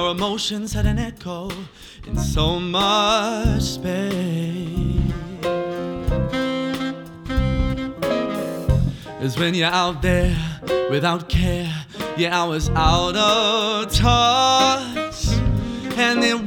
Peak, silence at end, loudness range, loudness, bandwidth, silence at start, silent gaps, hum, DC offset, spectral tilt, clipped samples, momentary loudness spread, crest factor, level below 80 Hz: -2 dBFS; 0 s; 6 LU; -20 LUFS; 19 kHz; 0 s; none; none; under 0.1%; -5 dB/octave; under 0.1%; 11 LU; 18 dB; -30 dBFS